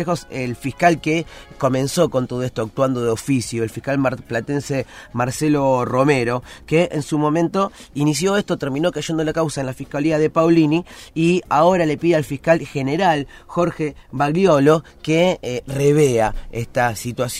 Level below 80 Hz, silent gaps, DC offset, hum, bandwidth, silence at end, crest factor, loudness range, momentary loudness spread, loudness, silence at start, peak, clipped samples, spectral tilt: -44 dBFS; none; under 0.1%; none; 16 kHz; 0 s; 16 dB; 3 LU; 10 LU; -19 LUFS; 0 s; -2 dBFS; under 0.1%; -6 dB/octave